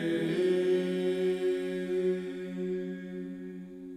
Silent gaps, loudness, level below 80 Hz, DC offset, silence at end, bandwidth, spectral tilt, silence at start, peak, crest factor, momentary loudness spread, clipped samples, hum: none; -31 LUFS; -72 dBFS; under 0.1%; 0 s; 10.5 kHz; -7 dB/octave; 0 s; -18 dBFS; 14 dB; 13 LU; under 0.1%; none